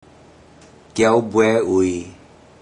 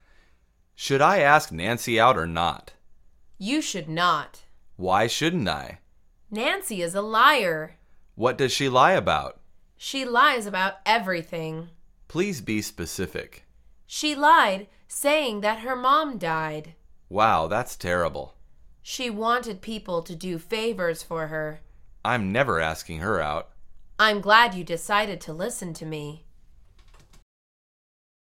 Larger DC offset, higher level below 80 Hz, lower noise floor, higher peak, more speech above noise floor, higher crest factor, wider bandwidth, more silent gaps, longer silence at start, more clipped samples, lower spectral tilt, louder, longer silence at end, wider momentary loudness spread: neither; about the same, -54 dBFS vs -52 dBFS; second, -47 dBFS vs -61 dBFS; about the same, -2 dBFS vs -2 dBFS; second, 30 dB vs 37 dB; about the same, 18 dB vs 22 dB; second, 10.5 kHz vs 17 kHz; neither; first, 0.95 s vs 0.8 s; neither; first, -5.5 dB/octave vs -4 dB/octave; first, -18 LUFS vs -24 LUFS; second, 0.5 s vs 2 s; about the same, 14 LU vs 16 LU